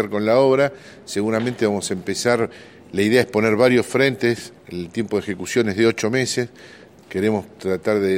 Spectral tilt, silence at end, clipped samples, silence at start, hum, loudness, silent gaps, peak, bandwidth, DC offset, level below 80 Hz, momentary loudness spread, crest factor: -5 dB/octave; 0 s; under 0.1%; 0 s; none; -20 LUFS; none; -2 dBFS; 16.5 kHz; under 0.1%; -58 dBFS; 12 LU; 18 dB